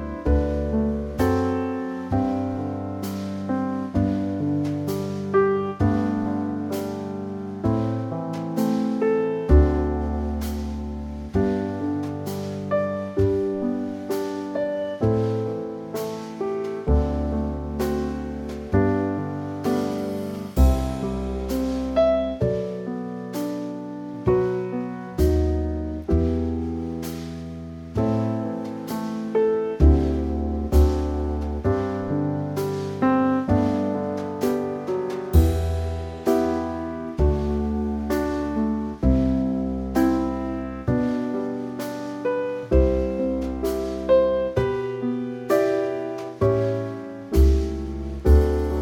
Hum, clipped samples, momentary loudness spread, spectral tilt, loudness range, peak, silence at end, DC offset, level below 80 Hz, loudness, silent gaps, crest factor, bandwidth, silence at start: none; under 0.1%; 10 LU; -8 dB/octave; 3 LU; -4 dBFS; 0 s; under 0.1%; -30 dBFS; -24 LUFS; none; 20 dB; 17.5 kHz; 0 s